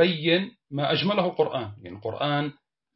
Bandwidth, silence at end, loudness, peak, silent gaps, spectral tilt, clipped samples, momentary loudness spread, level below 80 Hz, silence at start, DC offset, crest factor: 5.8 kHz; 0.45 s; -26 LUFS; -8 dBFS; none; -10 dB/octave; under 0.1%; 12 LU; -68 dBFS; 0 s; under 0.1%; 18 dB